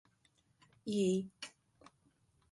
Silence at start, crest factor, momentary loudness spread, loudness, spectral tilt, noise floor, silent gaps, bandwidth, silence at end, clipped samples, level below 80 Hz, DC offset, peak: 0.85 s; 18 dB; 17 LU; -37 LUFS; -6 dB/octave; -74 dBFS; none; 11.5 kHz; 1.05 s; under 0.1%; -78 dBFS; under 0.1%; -22 dBFS